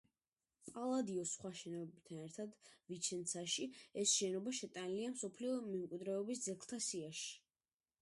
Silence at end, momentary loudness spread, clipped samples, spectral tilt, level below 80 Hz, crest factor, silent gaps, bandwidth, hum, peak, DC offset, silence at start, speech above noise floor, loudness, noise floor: 0.65 s; 14 LU; under 0.1%; -3 dB/octave; -86 dBFS; 20 dB; none; 11.5 kHz; none; -24 dBFS; under 0.1%; 0.65 s; over 46 dB; -43 LUFS; under -90 dBFS